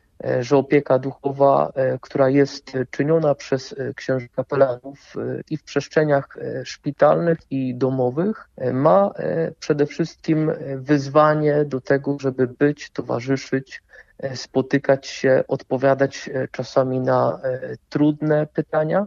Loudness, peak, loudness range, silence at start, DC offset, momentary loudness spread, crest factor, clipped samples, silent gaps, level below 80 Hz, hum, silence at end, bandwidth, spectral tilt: -21 LUFS; -2 dBFS; 3 LU; 0.25 s; under 0.1%; 11 LU; 18 dB; under 0.1%; none; -60 dBFS; none; 0 s; 7.4 kHz; -7 dB/octave